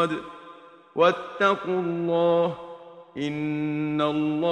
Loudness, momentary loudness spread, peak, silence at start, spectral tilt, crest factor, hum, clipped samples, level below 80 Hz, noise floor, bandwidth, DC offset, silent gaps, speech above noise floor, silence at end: -25 LUFS; 19 LU; -6 dBFS; 0 s; -7 dB/octave; 20 dB; none; under 0.1%; -66 dBFS; -48 dBFS; 9 kHz; under 0.1%; none; 24 dB; 0 s